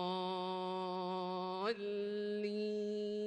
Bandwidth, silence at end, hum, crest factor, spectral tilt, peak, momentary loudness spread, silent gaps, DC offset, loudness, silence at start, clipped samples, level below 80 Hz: 9.6 kHz; 0 s; none; 14 dB; -6.5 dB/octave; -26 dBFS; 1 LU; none; under 0.1%; -40 LUFS; 0 s; under 0.1%; -84 dBFS